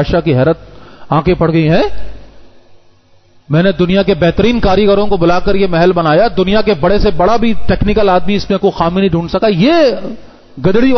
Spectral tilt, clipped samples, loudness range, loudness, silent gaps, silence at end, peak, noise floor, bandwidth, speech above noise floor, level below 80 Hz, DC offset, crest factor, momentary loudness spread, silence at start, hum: -7.5 dB/octave; under 0.1%; 4 LU; -11 LUFS; none; 0 s; 0 dBFS; -46 dBFS; 6.4 kHz; 36 dB; -28 dBFS; under 0.1%; 10 dB; 5 LU; 0 s; none